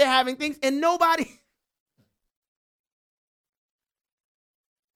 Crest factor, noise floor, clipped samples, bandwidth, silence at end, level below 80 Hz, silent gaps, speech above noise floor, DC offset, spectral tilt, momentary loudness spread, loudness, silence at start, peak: 22 dB; -71 dBFS; under 0.1%; 17 kHz; 3.7 s; -68 dBFS; none; 47 dB; under 0.1%; -2 dB/octave; 7 LU; -23 LUFS; 0 s; -6 dBFS